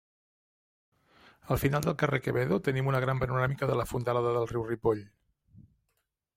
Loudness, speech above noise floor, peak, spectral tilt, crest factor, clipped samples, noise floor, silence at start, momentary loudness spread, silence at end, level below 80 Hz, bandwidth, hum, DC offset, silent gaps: -30 LUFS; 51 dB; -10 dBFS; -7 dB/octave; 20 dB; under 0.1%; -80 dBFS; 1.45 s; 2 LU; 1.3 s; -54 dBFS; 16 kHz; none; under 0.1%; none